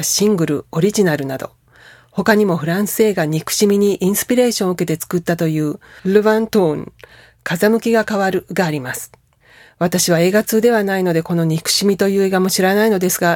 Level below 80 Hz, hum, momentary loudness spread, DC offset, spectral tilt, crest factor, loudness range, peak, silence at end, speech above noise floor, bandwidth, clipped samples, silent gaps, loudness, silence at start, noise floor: -54 dBFS; none; 10 LU; under 0.1%; -4.5 dB/octave; 16 dB; 3 LU; 0 dBFS; 0 s; 33 dB; 18.5 kHz; under 0.1%; none; -16 LUFS; 0 s; -48 dBFS